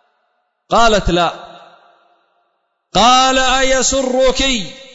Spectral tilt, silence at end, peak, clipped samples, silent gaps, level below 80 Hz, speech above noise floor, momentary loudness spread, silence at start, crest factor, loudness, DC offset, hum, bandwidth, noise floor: -2.5 dB/octave; 0.1 s; -2 dBFS; under 0.1%; none; -30 dBFS; 54 dB; 9 LU; 0.7 s; 14 dB; -13 LUFS; under 0.1%; none; 8 kHz; -66 dBFS